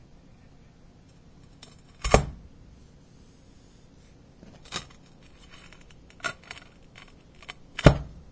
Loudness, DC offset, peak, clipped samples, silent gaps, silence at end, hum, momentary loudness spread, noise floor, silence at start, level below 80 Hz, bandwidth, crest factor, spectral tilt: -26 LUFS; under 0.1%; -2 dBFS; under 0.1%; none; 0.15 s; none; 30 LU; -53 dBFS; 2.05 s; -38 dBFS; 8 kHz; 30 dB; -5.5 dB/octave